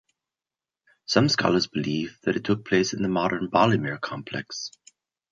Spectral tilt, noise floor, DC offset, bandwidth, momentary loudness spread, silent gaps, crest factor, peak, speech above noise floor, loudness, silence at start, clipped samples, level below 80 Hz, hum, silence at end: -5 dB/octave; under -90 dBFS; under 0.1%; 7.8 kHz; 12 LU; none; 22 dB; -4 dBFS; over 66 dB; -25 LUFS; 1.1 s; under 0.1%; -60 dBFS; none; 0.65 s